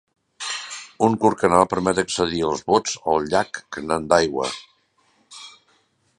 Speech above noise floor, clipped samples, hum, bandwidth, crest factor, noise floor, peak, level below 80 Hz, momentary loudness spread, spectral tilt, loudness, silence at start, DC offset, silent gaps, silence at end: 43 dB; under 0.1%; none; 11.5 kHz; 22 dB; -63 dBFS; 0 dBFS; -52 dBFS; 17 LU; -4 dB/octave; -21 LUFS; 0.4 s; under 0.1%; none; 0.7 s